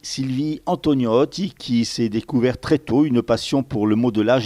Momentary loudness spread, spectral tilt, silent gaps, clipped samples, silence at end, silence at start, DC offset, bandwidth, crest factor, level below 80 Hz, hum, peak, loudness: 5 LU; -6 dB/octave; none; under 0.1%; 0 s; 0.05 s; under 0.1%; 13 kHz; 14 dB; -50 dBFS; none; -6 dBFS; -20 LUFS